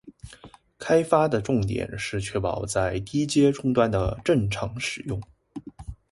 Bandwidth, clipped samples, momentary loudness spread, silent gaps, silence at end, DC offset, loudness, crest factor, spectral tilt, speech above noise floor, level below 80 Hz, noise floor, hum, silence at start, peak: 11.5 kHz; under 0.1%; 21 LU; none; 0.2 s; under 0.1%; -25 LUFS; 20 dB; -6 dB/octave; 26 dB; -44 dBFS; -50 dBFS; none; 0.05 s; -4 dBFS